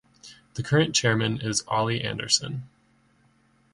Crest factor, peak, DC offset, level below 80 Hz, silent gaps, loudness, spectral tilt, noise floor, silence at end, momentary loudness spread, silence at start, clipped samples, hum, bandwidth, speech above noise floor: 22 dB; -6 dBFS; under 0.1%; -58 dBFS; none; -24 LUFS; -3.5 dB/octave; -63 dBFS; 1.05 s; 14 LU; 0.25 s; under 0.1%; none; 11.5 kHz; 38 dB